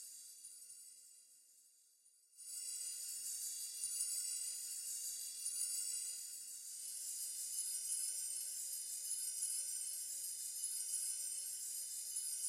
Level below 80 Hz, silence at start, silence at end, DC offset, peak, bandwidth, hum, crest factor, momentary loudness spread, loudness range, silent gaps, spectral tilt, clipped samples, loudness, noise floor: under -90 dBFS; 0 s; 0 s; under 0.1%; -26 dBFS; 16 kHz; none; 20 dB; 14 LU; 5 LU; none; 4.5 dB/octave; under 0.1%; -41 LUFS; -71 dBFS